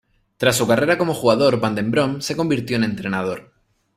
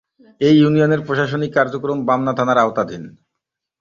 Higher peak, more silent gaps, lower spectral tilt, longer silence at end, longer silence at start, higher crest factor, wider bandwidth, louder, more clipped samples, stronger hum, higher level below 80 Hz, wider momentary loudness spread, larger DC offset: about the same, -2 dBFS vs -2 dBFS; neither; second, -5 dB/octave vs -7.5 dB/octave; second, 0.55 s vs 0.7 s; about the same, 0.4 s vs 0.4 s; about the same, 18 dB vs 16 dB; first, 16 kHz vs 7.2 kHz; about the same, -19 LUFS vs -17 LUFS; neither; neither; about the same, -54 dBFS vs -56 dBFS; about the same, 7 LU vs 9 LU; neither